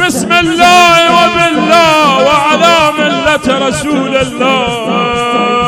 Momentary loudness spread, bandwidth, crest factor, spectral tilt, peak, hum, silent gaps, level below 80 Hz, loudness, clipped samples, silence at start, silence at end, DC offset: 7 LU; over 20 kHz; 8 dB; -3.5 dB/octave; 0 dBFS; none; none; -38 dBFS; -8 LUFS; 3%; 0 s; 0 s; under 0.1%